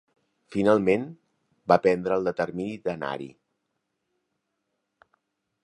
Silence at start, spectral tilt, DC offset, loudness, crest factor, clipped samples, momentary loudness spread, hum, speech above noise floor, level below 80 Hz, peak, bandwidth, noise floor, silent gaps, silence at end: 0.5 s; -7 dB/octave; under 0.1%; -25 LUFS; 24 dB; under 0.1%; 16 LU; none; 55 dB; -62 dBFS; -4 dBFS; 11 kHz; -79 dBFS; none; 2.35 s